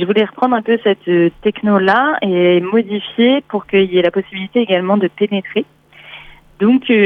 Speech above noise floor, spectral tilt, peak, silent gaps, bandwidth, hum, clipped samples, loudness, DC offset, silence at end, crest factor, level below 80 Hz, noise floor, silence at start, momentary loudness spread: 24 dB; -8.5 dB/octave; -2 dBFS; none; 5.4 kHz; none; under 0.1%; -15 LUFS; under 0.1%; 0 s; 14 dB; -54 dBFS; -38 dBFS; 0 s; 8 LU